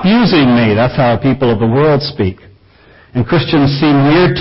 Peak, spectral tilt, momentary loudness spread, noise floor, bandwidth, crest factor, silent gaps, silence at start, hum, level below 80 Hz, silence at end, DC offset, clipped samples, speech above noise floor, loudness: -2 dBFS; -11 dB/octave; 9 LU; -44 dBFS; 5.8 kHz; 10 dB; none; 0 s; none; -36 dBFS; 0 s; under 0.1%; under 0.1%; 33 dB; -11 LUFS